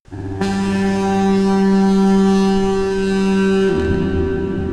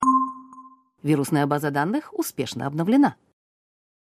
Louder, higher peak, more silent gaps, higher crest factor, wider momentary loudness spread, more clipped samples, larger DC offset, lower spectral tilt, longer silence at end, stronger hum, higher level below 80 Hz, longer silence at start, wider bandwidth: first, -16 LUFS vs -23 LUFS; about the same, -6 dBFS vs -6 dBFS; neither; second, 10 dB vs 18 dB; second, 6 LU vs 10 LU; neither; first, 0.5% vs under 0.1%; about the same, -7 dB/octave vs -6 dB/octave; second, 0 s vs 0.9 s; neither; first, -32 dBFS vs -68 dBFS; about the same, 0.1 s vs 0 s; second, 10.5 kHz vs 15.5 kHz